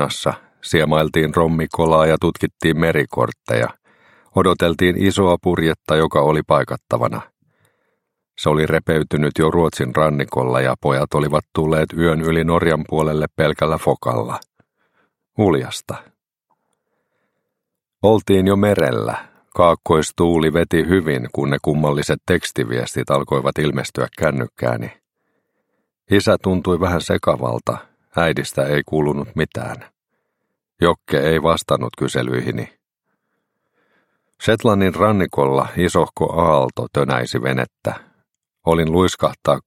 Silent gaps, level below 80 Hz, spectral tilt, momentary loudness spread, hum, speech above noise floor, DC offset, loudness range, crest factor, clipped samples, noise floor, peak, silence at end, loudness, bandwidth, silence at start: none; -42 dBFS; -6 dB/octave; 8 LU; none; 63 dB; under 0.1%; 5 LU; 18 dB; under 0.1%; -80 dBFS; 0 dBFS; 0.05 s; -18 LUFS; 16 kHz; 0 s